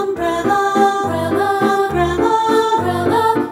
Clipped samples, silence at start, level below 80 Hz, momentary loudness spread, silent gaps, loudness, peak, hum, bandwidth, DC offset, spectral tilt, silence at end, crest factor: under 0.1%; 0 s; -40 dBFS; 4 LU; none; -16 LUFS; -2 dBFS; none; 17 kHz; under 0.1%; -5.5 dB/octave; 0 s; 14 dB